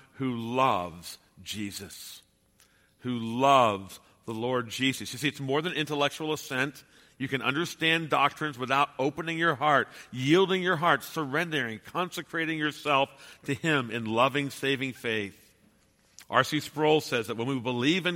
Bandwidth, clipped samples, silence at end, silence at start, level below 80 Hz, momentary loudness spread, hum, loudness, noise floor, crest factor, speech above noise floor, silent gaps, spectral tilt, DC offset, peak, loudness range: 16.5 kHz; under 0.1%; 0 s; 0.2 s; -68 dBFS; 13 LU; none; -28 LUFS; -65 dBFS; 22 dB; 37 dB; none; -4.5 dB/octave; under 0.1%; -6 dBFS; 4 LU